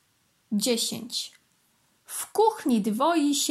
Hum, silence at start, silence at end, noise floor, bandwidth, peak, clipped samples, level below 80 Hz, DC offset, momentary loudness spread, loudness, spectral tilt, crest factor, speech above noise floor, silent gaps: none; 0.5 s; 0 s; -68 dBFS; 16 kHz; -10 dBFS; under 0.1%; -78 dBFS; under 0.1%; 11 LU; -26 LUFS; -3.5 dB/octave; 16 dB; 43 dB; none